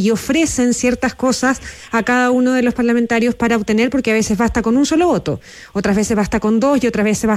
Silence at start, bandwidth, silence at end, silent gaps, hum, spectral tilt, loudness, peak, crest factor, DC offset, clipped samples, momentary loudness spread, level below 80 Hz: 0 s; 14 kHz; 0 s; none; none; -4.5 dB/octave; -16 LUFS; -4 dBFS; 10 dB; under 0.1%; under 0.1%; 5 LU; -38 dBFS